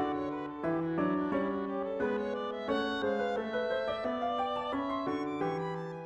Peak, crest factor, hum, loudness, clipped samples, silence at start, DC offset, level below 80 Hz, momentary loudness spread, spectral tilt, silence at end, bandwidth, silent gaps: -18 dBFS; 14 dB; none; -34 LUFS; under 0.1%; 0 s; under 0.1%; -64 dBFS; 4 LU; -7 dB/octave; 0 s; 8.2 kHz; none